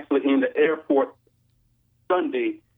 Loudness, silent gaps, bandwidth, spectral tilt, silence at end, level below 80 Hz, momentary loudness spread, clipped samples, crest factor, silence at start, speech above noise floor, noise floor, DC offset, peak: -23 LUFS; none; 3.9 kHz; -8 dB/octave; 0.2 s; -74 dBFS; 6 LU; under 0.1%; 16 dB; 0 s; 42 dB; -65 dBFS; under 0.1%; -8 dBFS